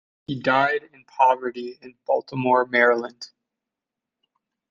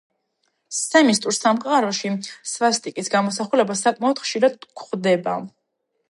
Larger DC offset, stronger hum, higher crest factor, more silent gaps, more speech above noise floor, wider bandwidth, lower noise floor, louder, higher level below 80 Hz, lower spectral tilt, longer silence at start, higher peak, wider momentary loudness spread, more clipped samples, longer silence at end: neither; neither; about the same, 22 dB vs 18 dB; neither; first, 64 dB vs 53 dB; second, 7.4 kHz vs 11.5 kHz; first, -86 dBFS vs -74 dBFS; about the same, -21 LUFS vs -20 LUFS; about the same, -70 dBFS vs -74 dBFS; first, -6 dB/octave vs -3.5 dB/octave; second, 0.3 s vs 0.7 s; about the same, -2 dBFS vs -4 dBFS; first, 20 LU vs 12 LU; neither; first, 1.45 s vs 0.65 s